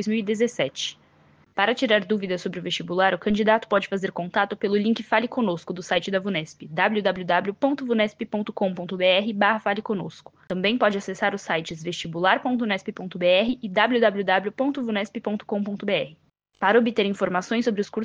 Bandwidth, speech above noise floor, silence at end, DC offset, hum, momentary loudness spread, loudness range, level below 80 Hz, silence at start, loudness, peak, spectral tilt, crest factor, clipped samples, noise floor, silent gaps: 9.4 kHz; 34 dB; 0 s; under 0.1%; none; 9 LU; 2 LU; -62 dBFS; 0 s; -24 LUFS; -4 dBFS; -5 dB/octave; 20 dB; under 0.1%; -57 dBFS; none